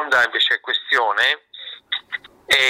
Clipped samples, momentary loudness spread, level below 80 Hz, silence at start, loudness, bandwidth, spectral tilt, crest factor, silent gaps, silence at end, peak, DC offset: under 0.1%; 15 LU; -62 dBFS; 0 s; -18 LUFS; 16 kHz; 0 dB/octave; 14 dB; none; 0 s; -6 dBFS; under 0.1%